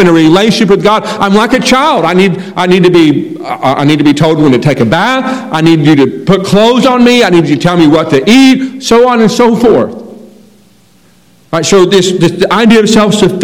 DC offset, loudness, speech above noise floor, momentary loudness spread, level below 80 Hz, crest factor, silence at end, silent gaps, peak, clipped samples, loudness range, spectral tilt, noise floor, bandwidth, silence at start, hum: 0.7%; -7 LUFS; 38 dB; 6 LU; -40 dBFS; 6 dB; 0 s; none; 0 dBFS; 9%; 4 LU; -5.5 dB/octave; -45 dBFS; 17 kHz; 0 s; none